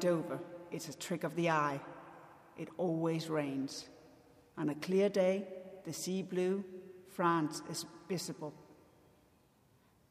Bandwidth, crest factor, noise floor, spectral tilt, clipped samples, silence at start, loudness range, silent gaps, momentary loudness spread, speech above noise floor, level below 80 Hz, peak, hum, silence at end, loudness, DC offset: 15.5 kHz; 18 dB; -69 dBFS; -5.5 dB/octave; under 0.1%; 0 s; 4 LU; none; 17 LU; 33 dB; -80 dBFS; -20 dBFS; none; 1.35 s; -37 LUFS; under 0.1%